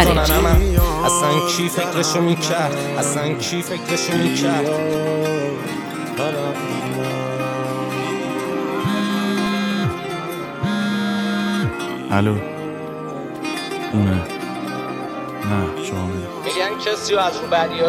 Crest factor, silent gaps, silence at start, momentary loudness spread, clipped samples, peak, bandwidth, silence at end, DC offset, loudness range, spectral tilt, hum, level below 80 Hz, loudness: 20 dB; none; 0 s; 9 LU; under 0.1%; 0 dBFS; 18.5 kHz; 0 s; under 0.1%; 5 LU; -4.5 dB/octave; none; -30 dBFS; -21 LUFS